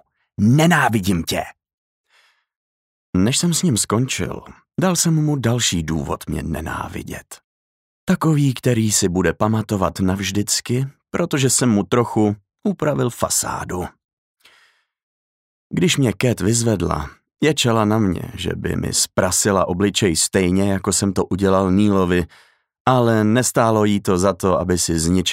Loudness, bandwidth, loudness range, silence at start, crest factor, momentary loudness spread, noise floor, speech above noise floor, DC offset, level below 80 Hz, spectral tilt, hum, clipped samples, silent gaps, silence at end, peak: -18 LUFS; 16 kHz; 5 LU; 0.4 s; 16 dB; 10 LU; -59 dBFS; 41 dB; under 0.1%; -42 dBFS; -4.5 dB/octave; none; under 0.1%; 1.73-2.04 s, 2.56-3.13 s, 7.44-8.07 s, 14.04-14.35 s, 15.03-15.70 s, 22.80-22.85 s; 0 s; -2 dBFS